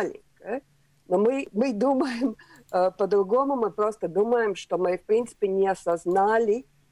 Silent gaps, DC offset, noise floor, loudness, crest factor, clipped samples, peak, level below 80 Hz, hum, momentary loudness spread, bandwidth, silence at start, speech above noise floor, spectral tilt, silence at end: none; under 0.1%; -61 dBFS; -25 LUFS; 14 dB; under 0.1%; -10 dBFS; -64 dBFS; none; 10 LU; 11.5 kHz; 0 s; 36 dB; -6 dB/octave; 0.3 s